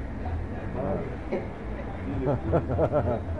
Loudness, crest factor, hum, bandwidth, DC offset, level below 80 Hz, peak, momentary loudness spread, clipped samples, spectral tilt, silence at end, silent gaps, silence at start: -30 LUFS; 16 dB; none; 6.4 kHz; 0.6%; -38 dBFS; -12 dBFS; 10 LU; under 0.1%; -9.5 dB/octave; 0 s; none; 0 s